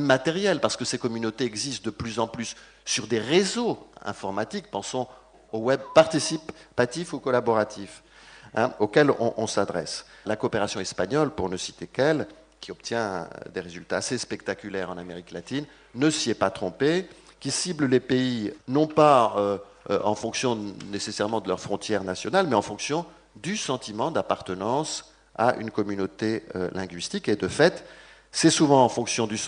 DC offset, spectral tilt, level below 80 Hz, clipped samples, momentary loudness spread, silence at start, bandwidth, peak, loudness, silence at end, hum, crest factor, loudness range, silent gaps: under 0.1%; -4 dB/octave; -60 dBFS; under 0.1%; 14 LU; 0 s; 10 kHz; -4 dBFS; -26 LUFS; 0 s; none; 22 dB; 5 LU; none